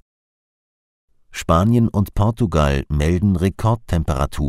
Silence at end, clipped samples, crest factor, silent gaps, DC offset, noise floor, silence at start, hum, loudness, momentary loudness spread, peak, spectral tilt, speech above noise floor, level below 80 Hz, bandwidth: 0 s; under 0.1%; 16 dB; none; under 0.1%; under -90 dBFS; 1.3 s; none; -18 LUFS; 6 LU; -2 dBFS; -7.5 dB/octave; over 73 dB; -28 dBFS; 15 kHz